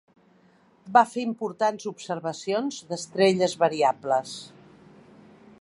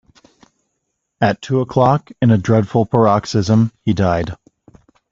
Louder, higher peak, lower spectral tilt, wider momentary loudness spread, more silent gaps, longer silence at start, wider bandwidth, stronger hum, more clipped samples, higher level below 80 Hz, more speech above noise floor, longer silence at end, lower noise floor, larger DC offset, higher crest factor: second, -25 LUFS vs -16 LUFS; second, -4 dBFS vs 0 dBFS; second, -4.5 dB/octave vs -7.5 dB/octave; first, 13 LU vs 5 LU; neither; second, 0.85 s vs 1.2 s; first, 11.5 kHz vs 7.6 kHz; neither; neither; second, -74 dBFS vs -46 dBFS; second, 35 dB vs 58 dB; first, 1.15 s vs 0.8 s; second, -59 dBFS vs -73 dBFS; neither; first, 22 dB vs 16 dB